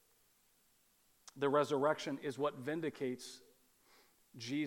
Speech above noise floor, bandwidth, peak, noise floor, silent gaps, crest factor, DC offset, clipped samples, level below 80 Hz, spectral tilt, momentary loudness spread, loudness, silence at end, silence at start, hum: 36 dB; 17.5 kHz; -20 dBFS; -73 dBFS; none; 22 dB; under 0.1%; under 0.1%; -86 dBFS; -5 dB/octave; 17 LU; -38 LUFS; 0 s; 1.35 s; none